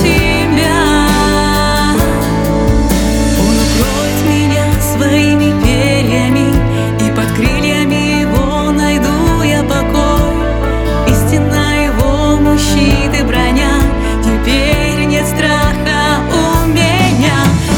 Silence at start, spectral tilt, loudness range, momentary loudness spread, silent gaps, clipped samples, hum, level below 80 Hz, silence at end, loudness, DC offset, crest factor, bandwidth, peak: 0 s; -5 dB/octave; 1 LU; 3 LU; none; under 0.1%; none; -18 dBFS; 0 s; -11 LUFS; under 0.1%; 10 dB; over 20 kHz; 0 dBFS